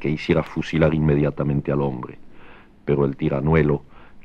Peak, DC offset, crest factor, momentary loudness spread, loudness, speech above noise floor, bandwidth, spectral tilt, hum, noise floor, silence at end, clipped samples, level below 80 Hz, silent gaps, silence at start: -4 dBFS; under 0.1%; 18 dB; 9 LU; -21 LUFS; 23 dB; 7 kHz; -9 dB/octave; none; -43 dBFS; 0 s; under 0.1%; -38 dBFS; none; 0 s